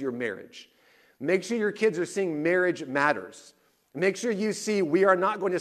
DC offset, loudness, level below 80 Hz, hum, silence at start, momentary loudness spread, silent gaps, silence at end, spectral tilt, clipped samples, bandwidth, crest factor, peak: under 0.1%; -26 LUFS; -76 dBFS; none; 0 s; 12 LU; none; 0 s; -5 dB/octave; under 0.1%; 13.5 kHz; 18 dB; -8 dBFS